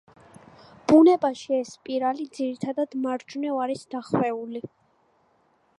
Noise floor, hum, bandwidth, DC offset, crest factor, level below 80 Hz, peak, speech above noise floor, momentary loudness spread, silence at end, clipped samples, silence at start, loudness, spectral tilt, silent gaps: -65 dBFS; none; 11 kHz; under 0.1%; 20 dB; -66 dBFS; -6 dBFS; 41 dB; 16 LU; 1.1 s; under 0.1%; 0.9 s; -24 LUFS; -6.5 dB/octave; none